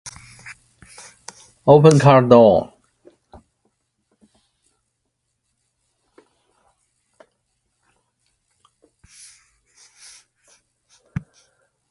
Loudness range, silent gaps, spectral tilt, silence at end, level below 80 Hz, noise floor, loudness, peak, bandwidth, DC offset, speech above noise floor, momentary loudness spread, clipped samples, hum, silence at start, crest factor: 25 LU; none; -7 dB/octave; 9.25 s; -54 dBFS; -74 dBFS; -13 LUFS; 0 dBFS; 11.5 kHz; under 0.1%; 63 dB; 30 LU; under 0.1%; none; 0.05 s; 22 dB